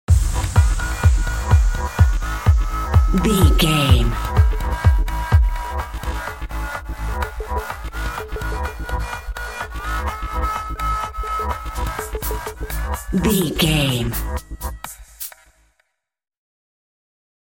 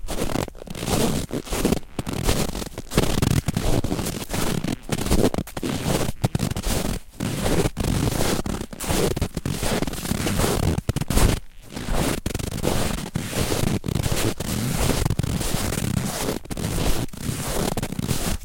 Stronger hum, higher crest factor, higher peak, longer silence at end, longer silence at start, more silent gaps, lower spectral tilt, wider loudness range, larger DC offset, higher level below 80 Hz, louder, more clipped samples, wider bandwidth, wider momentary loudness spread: neither; about the same, 18 dB vs 18 dB; first, 0 dBFS vs -4 dBFS; first, 2.25 s vs 0 s; about the same, 0.1 s vs 0 s; neither; about the same, -5.5 dB/octave vs -4.5 dB/octave; first, 10 LU vs 1 LU; second, under 0.1% vs 0.3%; first, -22 dBFS vs -30 dBFS; first, -21 LUFS vs -25 LUFS; neither; about the same, 17 kHz vs 17 kHz; first, 12 LU vs 6 LU